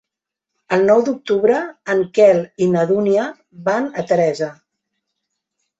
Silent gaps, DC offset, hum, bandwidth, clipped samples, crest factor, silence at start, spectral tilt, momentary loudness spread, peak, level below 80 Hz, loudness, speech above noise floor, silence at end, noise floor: none; under 0.1%; none; 8 kHz; under 0.1%; 16 dB; 0.7 s; -6.5 dB/octave; 8 LU; -2 dBFS; -62 dBFS; -17 LUFS; 67 dB; 1.25 s; -83 dBFS